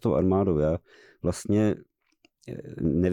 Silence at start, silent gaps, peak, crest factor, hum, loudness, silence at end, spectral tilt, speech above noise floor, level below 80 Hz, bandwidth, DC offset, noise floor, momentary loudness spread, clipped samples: 0.05 s; none; -14 dBFS; 12 dB; none; -26 LUFS; 0 s; -8 dB/octave; 41 dB; -46 dBFS; 14 kHz; under 0.1%; -67 dBFS; 16 LU; under 0.1%